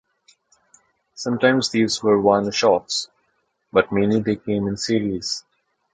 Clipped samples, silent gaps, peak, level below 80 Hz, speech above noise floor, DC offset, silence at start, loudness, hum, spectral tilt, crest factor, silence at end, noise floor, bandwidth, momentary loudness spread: under 0.1%; none; -2 dBFS; -54 dBFS; 50 dB; under 0.1%; 1.15 s; -20 LUFS; none; -4.5 dB/octave; 20 dB; 0.55 s; -69 dBFS; 9.4 kHz; 9 LU